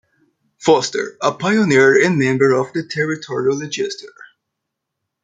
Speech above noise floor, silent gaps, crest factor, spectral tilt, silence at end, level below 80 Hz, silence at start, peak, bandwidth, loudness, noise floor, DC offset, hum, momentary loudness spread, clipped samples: 62 dB; none; 16 dB; -5 dB/octave; 1.15 s; -60 dBFS; 0.6 s; 0 dBFS; 9.2 kHz; -16 LUFS; -79 dBFS; under 0.1%; none; 11 LU; under 0.1%